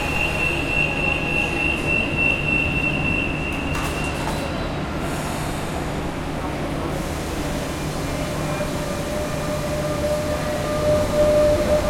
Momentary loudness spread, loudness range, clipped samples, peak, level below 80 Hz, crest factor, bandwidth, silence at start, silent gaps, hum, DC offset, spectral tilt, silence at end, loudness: 8 LU; 6 LU; under 0.1%; -8 dBFS; -34 dBFS; 14 dB; 16.5 kHz; 0 s; none; none; under 0.1%; -5 dB/octave; 0 s; -22 LUFS